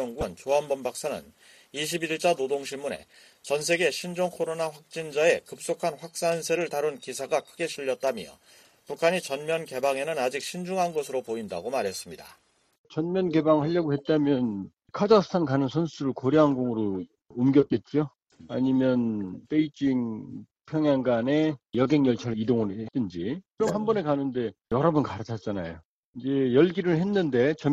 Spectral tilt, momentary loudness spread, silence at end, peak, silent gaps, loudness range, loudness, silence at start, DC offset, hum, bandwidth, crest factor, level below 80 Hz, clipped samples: -5.5 dB/octave; 12 LU; 0 s; -6 dBFS; 12.78-12.84 s, 25.85-26.13 s; 5 LU; -27 LUFS; 0 s; under 0.1%; none; 14 kHz; 20 dB; -60 dBFS; under 0.1%